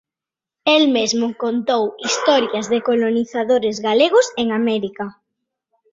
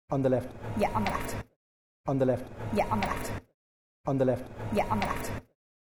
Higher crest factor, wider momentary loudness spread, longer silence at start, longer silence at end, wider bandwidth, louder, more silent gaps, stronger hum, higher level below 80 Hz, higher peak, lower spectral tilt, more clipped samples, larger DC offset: about the same, 16 dB vs 18 dB; second, 8 LU vs 11 LU; first, 0.65 s vs 0.1 s; first, 0.8 s vs 0.45 s; second, 7.8 kHz vs 16.5 kHz; first, -18 LUFS vs -31 LUFS; second, none vs 1.56-2.04 s, 3.54-4.04 s; neither; second, -64 dBFS vs -46 dBFS; first, -2 dBFS vs -12 dBFS; second, -3 dB/octave vs -6.5 dB/octave; neither; neither